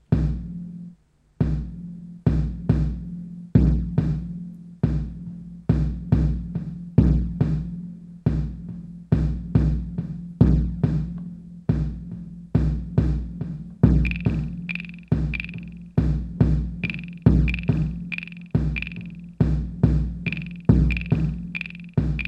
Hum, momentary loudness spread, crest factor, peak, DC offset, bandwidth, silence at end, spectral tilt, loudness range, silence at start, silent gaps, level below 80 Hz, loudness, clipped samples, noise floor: none; 16 LU; 22 dB; -2 dBFS; under 0.1%; 5.6 kHz; 0 s; -9.5 dB/octave; 2 LU; 0.1 s; none; -28 dBFS; -24 LUFS; under 0.1%; -54 dBFS